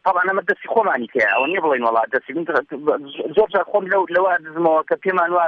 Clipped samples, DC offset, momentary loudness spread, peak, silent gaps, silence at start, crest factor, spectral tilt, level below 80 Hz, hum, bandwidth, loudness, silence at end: under 0.1%; under 0.1%; 5 LU; -4 dBFS; none; 0.05 s; 14 dB; -6.5 dB/octave; -64 dBFS; none; 6.6 kHz; -19 LUFS; 0 s